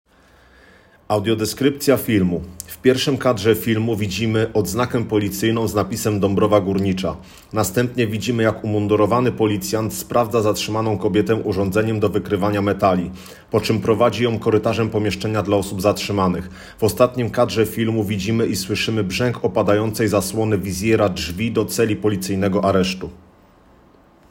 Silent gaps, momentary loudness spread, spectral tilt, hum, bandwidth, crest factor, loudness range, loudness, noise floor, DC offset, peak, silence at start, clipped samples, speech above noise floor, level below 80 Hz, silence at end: none; 5 LU; -5.5 dB/octave; none; 16.5 kHz; 18 dB; 1 LU; -19 LUFS; -51 dBFS; under 0.1%; 0 dBFS; 1.1 s; under 0.1%; 33 dB; -48 dBFS; 1.15 s